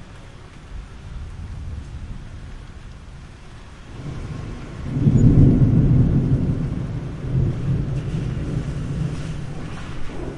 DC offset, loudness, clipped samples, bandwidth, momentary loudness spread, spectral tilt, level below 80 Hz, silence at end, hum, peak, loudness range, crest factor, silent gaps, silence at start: under 0.1%; -21 LUFS; under 0.1%; 10.5 kHz; 25 LU; -9 dB/octave; -30 dBFS; 0 s; none; -2 dBFS; 18 LU; 20 dB; none; 0 s